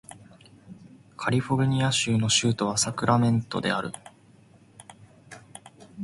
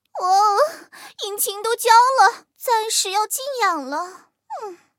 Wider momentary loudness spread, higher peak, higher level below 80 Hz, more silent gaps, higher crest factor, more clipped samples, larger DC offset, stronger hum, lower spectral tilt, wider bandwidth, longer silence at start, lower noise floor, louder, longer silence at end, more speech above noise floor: first, 23 LU vs 20 LU; second, -6 dBFS vs 0 dBFS; first, -58 dBFS vs -88 dBFS; neither; about the same, 20 dB vs 20 dB; neither; neither; neither; first, -4 dB/octave vs 2 dB/octave; second, 11.5 kHz vs 16.5 kHz; about the same, 0.1 s vs 0.15 s; first, -55 dBFS vs -40 dBFS; second, -24 LUFS vs -18 LUFS; second, 0 s vs 0.25 s; first, 31 dB vs 21 dB